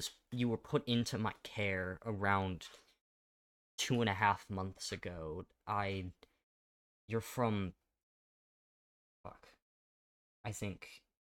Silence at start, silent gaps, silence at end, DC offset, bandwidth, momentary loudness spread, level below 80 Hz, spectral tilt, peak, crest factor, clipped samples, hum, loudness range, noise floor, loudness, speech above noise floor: 0 s; 3.01-3.78 s, 6.43-7.08 s, 8.03-9.24 s, 9.62-10.44 s; 0.2 s; under 0.1%; 17 kHz; 17 LU; -66 dBFS; -5 dB/octave; -16 dBFS; 24 dB; under 0.1%; none; 8 LU; under -90 dBFS; -38 LUFS; over 52 dB